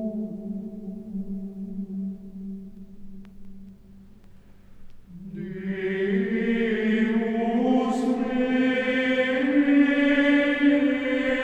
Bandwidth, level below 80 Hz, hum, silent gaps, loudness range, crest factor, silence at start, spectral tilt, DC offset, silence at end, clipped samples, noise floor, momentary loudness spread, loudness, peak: 8.6 kHz; -52 dBFS; none; none; 19 LU; 16 dB; 0 s; -7 dB/octave; under 0.1%; 0 s; under 0.1%; -48 dBFS; 17 LU; -24 LUFS; -10 dBFS